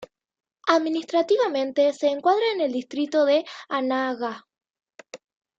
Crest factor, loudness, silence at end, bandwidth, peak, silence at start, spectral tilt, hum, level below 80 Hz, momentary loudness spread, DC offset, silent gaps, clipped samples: 20 dB; -23 LUFS; 0.4 s; 7.8 kHz; -6 dBFS; 0 s; -3.5 dB/octave; none; -78 dBFS; 9 LU; under 0.1%; 4.70-4.74 s; under 0.1%